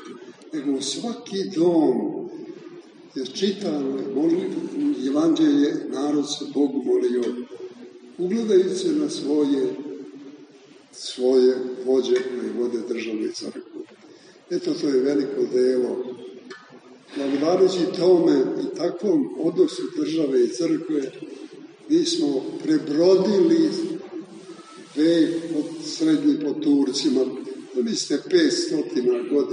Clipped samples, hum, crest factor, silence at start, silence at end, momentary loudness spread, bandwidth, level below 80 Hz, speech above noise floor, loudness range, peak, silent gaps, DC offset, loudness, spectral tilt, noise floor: under 0.1%; none; 16 dB; 0 s; 0 s; 19 LU; 10 kHz; -76 dBFS; 28 dB; 4 LU; -8 dBFS; none; under 0.1%; -22 LUFS; -5 dB/octave; -49 dBFS